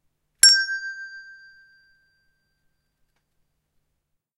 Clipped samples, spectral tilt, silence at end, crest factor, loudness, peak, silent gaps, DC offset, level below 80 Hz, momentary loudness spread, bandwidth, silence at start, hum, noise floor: under 0.1%; 5.5 dB/octave; 3.15 s; 26 dB; -16 LUFS; 0 dBFS; none; under 0.1%; -68 dBFS; 24 LU; 16 kHz; 0.45 s; none; -76 dBFS